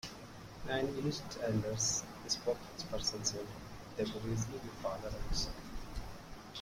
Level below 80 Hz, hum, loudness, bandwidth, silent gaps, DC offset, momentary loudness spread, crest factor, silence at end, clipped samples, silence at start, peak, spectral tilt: -50 dBFS; none; -39 LUFS; 16.5 kHz; none; under 0.1%; 14 LU; 20 dB; 0 s; under 0.1%; 0.05 s; -18 dBFS; -3.5 dB/octave